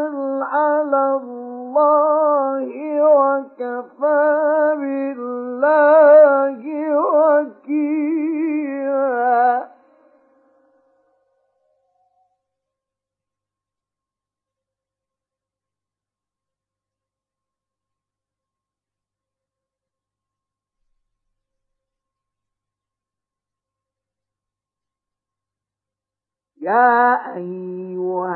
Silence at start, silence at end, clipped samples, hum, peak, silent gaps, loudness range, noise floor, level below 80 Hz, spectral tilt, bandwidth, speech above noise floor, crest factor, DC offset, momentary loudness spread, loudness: 0 s; 0 s; under 0.1%; none; -2 dBFS; none; 8 LU; -89 dBFS; -86 dBFS; -11 dB/octave; 4.2 kHz; 72 dB; 20 dB; under 0.1%; 14 LU; -17 LUFS